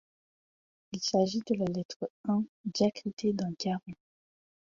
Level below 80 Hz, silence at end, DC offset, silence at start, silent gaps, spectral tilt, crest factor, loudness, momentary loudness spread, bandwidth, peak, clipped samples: -70 dBFS; 0.85 s; under 0.1%; 0.9 s; 1.85-1.89 s, 1.96-2.00 s, 2.10-2.24 s, 2.49-2.64 s, 3.13-3.17 s; -5.5 dB/octave; 18 dB; -32 LUFS; 10 LU; 7.6 kHz; -14 dBFS; under 0.1%